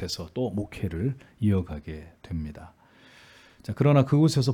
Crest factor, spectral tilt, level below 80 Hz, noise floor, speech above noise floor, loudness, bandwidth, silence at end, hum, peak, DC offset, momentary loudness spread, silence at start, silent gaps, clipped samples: 18 dB; -7 dB/octave; -50 dBFS; -54 dBFS; 28 dB; -26 LUFS; 14.5 kHz; 0 s; none; -8 dBFS; under 0.1%; 20 LU; 0 s; none; under 0.1%